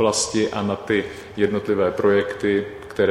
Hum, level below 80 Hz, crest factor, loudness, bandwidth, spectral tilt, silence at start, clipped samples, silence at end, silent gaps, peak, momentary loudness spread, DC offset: none; -52 dBFS; 16 dB; -22 LUFS; 12 kHz; -4 dB/octave; 0 s; under 0.1%; 0 s; none; -4 dBFS; 5 LU; under 0.1%